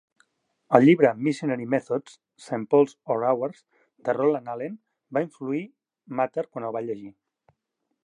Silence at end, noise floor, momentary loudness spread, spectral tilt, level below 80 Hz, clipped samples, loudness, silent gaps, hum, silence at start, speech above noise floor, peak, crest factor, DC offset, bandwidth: 0.95 s; -79 dBFS; 16 LU; -7.5 dB/octave; -78 dBFS; under 0.1%; -25 LUFS; none; none; 0.7 s; 55 dB; -2 dBFS; 24 dB; under 0.1%; 10.5 kHz